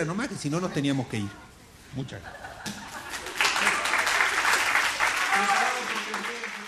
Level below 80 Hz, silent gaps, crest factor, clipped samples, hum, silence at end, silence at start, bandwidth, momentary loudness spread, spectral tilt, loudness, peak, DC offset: -58 dBFS; none; 22 dB; under 0.1%; none; 0 s; 0 s; 14 kHz; 16 LU; -2.5 dB/octave; -25 LUFS; -6 dBFS; under 0.1%